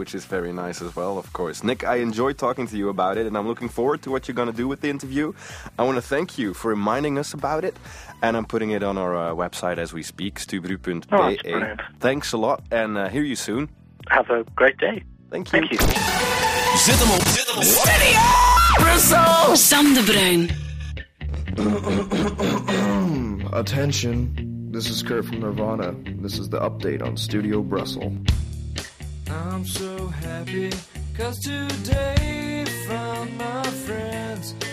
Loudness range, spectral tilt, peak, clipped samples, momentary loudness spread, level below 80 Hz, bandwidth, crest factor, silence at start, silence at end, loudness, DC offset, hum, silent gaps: 12 LU; -3.5 dB/octave; -4 dBFS; under 0.1%; 16 LU; -34 dBFS; 15.5 kHz; 18 dB; 0 s; 0 s; -21 LUFS; under 0.1%; none; none